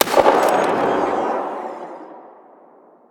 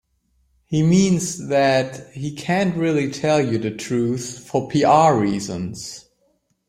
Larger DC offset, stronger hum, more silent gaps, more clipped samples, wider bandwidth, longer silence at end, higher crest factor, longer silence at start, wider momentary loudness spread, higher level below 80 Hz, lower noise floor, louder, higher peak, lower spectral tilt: neither; neither; neither; neither; first, over 20 kHz vs 15 kHz; first, 0.85 s vs 0.7 s; about the same, 20 dB vs 18 dB; second, 0 s vs 0.7 s; first, 21 LU vs 14 LU; about the same, -56 dBFS vs -56 dBFS; second, -49 dBFS vs -66 dBFS; about the same, -18 LUFS vs -20 LUFS; about the same, 0 dBFS vs -2 dBFS; second, -3.5 dB/octave vs -5.5 dB/octave